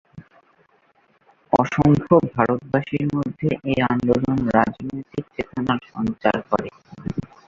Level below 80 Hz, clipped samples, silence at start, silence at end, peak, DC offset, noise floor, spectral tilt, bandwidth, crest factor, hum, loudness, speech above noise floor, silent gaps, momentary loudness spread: -48 dBFS; under 0.1%; 0.15 s; 0.25 s; -2 dBFS; under 0.1%; -60 dBFS; -8 dB/octave; 7.6 kHz; 20 dB; none; -21 LUFS; 40 dB; none; 13 LU